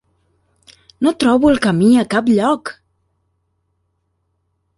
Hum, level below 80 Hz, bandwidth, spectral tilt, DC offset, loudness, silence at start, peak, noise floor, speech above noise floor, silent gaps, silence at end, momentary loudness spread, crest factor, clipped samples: none; -48 dBFS; 11.5 kHz; -6 dB/octave; under 0.1%; -14 LUFS; 1 s; -2 dBFS; -68 dBFS; 54 dB; none; 2.05 s; 7 LU; 16 dB; under 0.1%